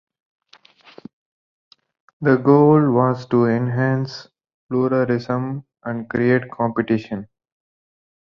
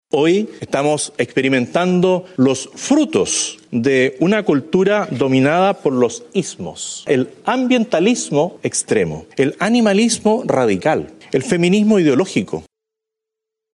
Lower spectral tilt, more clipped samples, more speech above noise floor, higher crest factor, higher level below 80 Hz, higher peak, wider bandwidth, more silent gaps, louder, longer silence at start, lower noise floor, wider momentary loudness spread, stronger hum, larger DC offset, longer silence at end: first, -9 dB/octave vs -5 dB/octave; neither; second, 33 dB vs 67 dB; about the same, 18 dB vs 14 dB; about the same, -60 dBFS vs -56 dBFS; about the same, -2 dBFS vs -2 dBFS; second, 6.8 kHz vs 11.5 kHz; first, 4.54-4.69 s vs none; about the same, -19 LUFS vs -17 LUFS; first, 2.2 s vs 0.15 s; second, -51 dBFS vs -83 dBFS; first, 16 LU vs 8 LU; neither; neither; about the same, 1.15 s vs 1.1 s